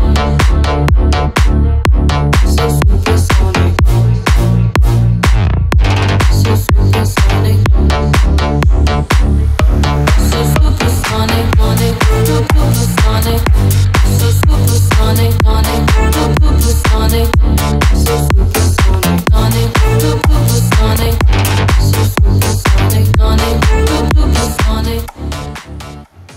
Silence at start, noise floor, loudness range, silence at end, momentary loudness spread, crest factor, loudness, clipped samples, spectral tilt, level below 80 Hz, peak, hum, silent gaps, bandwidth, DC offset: 0 s; -31 dBFS; 1 LU; 0.05 s; 2 LU; 10 dB; -11 LUFS; under 0.1%; -5.5 dB/octave; -12 dBFS; 0 dBFS; none; none; 16.5 kHz; under 0.1%